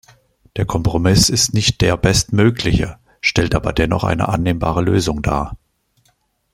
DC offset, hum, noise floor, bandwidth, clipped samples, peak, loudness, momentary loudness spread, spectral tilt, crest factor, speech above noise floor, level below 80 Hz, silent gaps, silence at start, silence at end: under 0.1%; none; -62 dBFS; 16 kHz; under 0.1%; -2 dBFS; -16 LUFS; 8 LU; -4.5 dB/octave; 16 dB; 46 dB; -32 dBFS; none; 0.55 s; 1 s